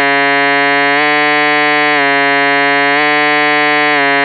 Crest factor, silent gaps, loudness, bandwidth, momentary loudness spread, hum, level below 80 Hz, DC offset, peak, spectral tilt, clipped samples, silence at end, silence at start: 10 dB; none; -9 LUFS; 5 kHz; 0 LU; none; under -90 dBFS; under 0.1%; 0 dBFS; -9.5 dB/octave; under 0.1%; 0 s; 0 s